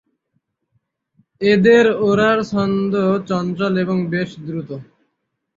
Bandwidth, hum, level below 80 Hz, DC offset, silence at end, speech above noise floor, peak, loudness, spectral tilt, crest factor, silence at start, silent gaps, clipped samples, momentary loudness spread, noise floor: 7.4 kHz; none; -56 dBFS; under 0.1%; 0.75 s; 57 dB; -2 dBFS; -17 LUFS; -7 dB/octave; 18 dB; 1.4 s; none; under 0.1%; 16 LU; -74 dBFS